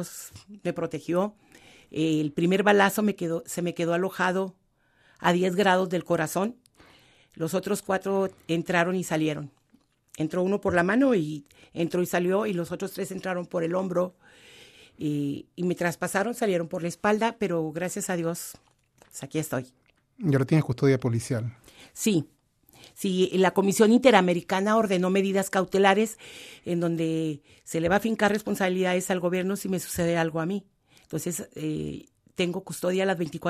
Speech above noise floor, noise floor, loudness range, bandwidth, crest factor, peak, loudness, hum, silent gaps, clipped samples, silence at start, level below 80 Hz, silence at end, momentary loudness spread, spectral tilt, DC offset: 39 dB; -65 dBFS; 7 LU; 14 kHz; 22 dB; -4 dBFS; -26 LUFS; none; none; under 0.1%; 0 s; -62 dBFS; 0 s; 12 LU; -5.5 dB/octave; under 0.1%